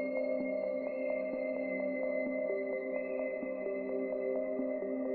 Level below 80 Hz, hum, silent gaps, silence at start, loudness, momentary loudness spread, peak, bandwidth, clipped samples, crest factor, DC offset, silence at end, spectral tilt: -74 dBFS; none; none; 0 s; -36 LUFS; 2 LU; -24 dBFS; 4.5 kHz; under 0.1%; 12 dB; under 0.1%; 0 s; -6.5 dB/octave